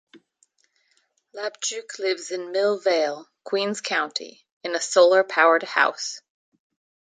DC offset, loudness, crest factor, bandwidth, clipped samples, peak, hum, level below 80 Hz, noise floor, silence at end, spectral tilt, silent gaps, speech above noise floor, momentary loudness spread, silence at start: under 0.1%; -22 LUFS; 22 dB; 9.6 kHz; under 0.1%; -4 dBFS; none; -84 dBFS; -68 dBFS; 0.9 s; -1.5 dB/octave; 4.52-4.61 s; 45 dB; 15 LU; 0.15 s